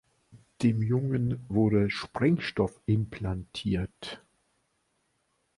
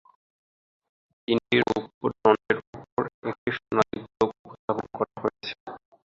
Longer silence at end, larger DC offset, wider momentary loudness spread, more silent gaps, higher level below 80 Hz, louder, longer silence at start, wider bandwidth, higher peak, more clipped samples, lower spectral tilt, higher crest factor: first, 1.4 s vs 0.35 s; neither; second, 10 LU vs 14 LU; second, none vs 1.94-2.01 s, 2.67-2.73 s, 2.92-2.97 s, 3.14-3.22 s, 3.38-3.46 s, 4.39-4.45 s, 4.59-4.68 s, 5.60-5.66 s; first, -50 dBFS vs -62 dBFS; about the same, -29 LUFS vs -27 LUFS; second, 0.35 s vs 1.3 s; first, 11.5 kHz vs 7.6 kHz; second, -12 dBFS vs -4 dBFS; neither; first, -7.5 dB/octave vs -6 dB/octave; second, 18 dB vs 24 dB